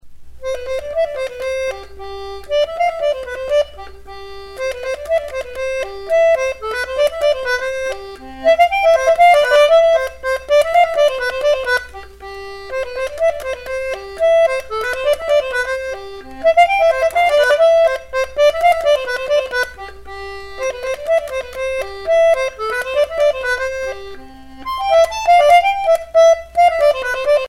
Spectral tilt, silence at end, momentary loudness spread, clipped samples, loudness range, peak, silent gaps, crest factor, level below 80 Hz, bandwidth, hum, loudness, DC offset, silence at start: -2 dB/octave; 0 s; 18 LU; under 0.1%; 8 LU; -2 dBFS; none; 14 dB; -44 dBFS; 15 kHz; none; -16 LUFS; under 0.1%; 0.05 s